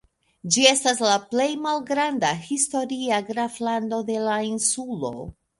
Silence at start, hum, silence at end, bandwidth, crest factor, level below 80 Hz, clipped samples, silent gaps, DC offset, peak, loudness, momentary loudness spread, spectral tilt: 0.45 s; none; 0.25 s; 11.5 kHz; 22 dB; -60 dBFS; under 0.1%; none; under 0.1%; -2 dBFS; -23 LUFS; 11 LU; -2 dB/octave